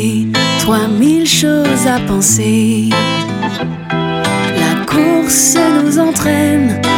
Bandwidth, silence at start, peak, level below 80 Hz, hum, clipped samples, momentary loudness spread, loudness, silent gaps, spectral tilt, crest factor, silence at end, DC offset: 18 kHz; 0 s; 0 dBFS; -40 dBFS; none; under 0.1%; 7 LU; -12 LUFS; none; -4 dB/octave; 12 dB; 0 s; under 0.1%